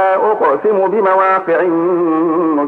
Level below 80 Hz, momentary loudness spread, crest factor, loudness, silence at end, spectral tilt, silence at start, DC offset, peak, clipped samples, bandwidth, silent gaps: -66 dBFS; 2 LU; 10 dB; -13 LUFS; 0 s; -8.5 dB/octave; 0 s; under 0.1%; -4 dBFS; under 0.1%; 4.3 kHz; none